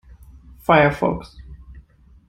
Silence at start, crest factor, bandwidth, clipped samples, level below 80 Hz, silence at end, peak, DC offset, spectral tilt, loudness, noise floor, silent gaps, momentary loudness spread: 0.7 s; 20 dB; 16 kHz; under 0.1%; -42 dBFS; 0.5 s; -2 dBFS; under 0.1%; -7.5 dB/octave; -19 LUFS; -49 dBFS; none; 17 LU